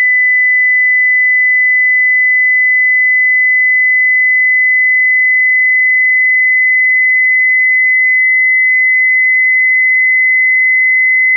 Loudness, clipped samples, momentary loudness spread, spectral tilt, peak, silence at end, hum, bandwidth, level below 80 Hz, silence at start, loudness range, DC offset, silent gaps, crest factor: -7 LUFS; under 0.1%; 0 LU; 20 dB/octave; -6 dBFS; 0 s; none; 2.2 kHz; under -90 dBFS; 0 s; 0 LU; under 0.1%; none; 4 dB